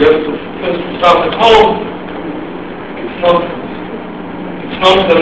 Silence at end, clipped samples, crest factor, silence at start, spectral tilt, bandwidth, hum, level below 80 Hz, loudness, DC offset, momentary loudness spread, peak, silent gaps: 0 s; 0.6%; 12 dB; 0 s; -5.5 dB/octave; 8 kHz; none; -38 dBFS; -12 LUFS; 1%; 16 LU; 0 dBFS; none